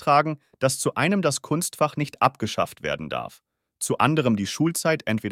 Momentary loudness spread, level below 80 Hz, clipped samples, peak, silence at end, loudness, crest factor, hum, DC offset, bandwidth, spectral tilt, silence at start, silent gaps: 9 LU; -62 dBFS; under 0.1%; -4 dBFS; 0 s; -24 LUFS; 20 dB; none; under 0.1%; 16.5 kHz; -4.5 dB/octave; 0 s; none